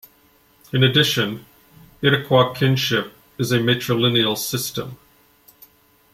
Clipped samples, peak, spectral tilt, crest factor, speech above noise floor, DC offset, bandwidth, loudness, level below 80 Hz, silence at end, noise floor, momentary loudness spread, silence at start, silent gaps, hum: under 0.1%; -2 dBFS; -4.5 dB/octave; 20 dB; 37 dB; under 0.1%; 16 kHz; -19 LUFS; -56 dBFS; 1.2 s; -56 dBFS; 11 LU; 0.75 s; none; none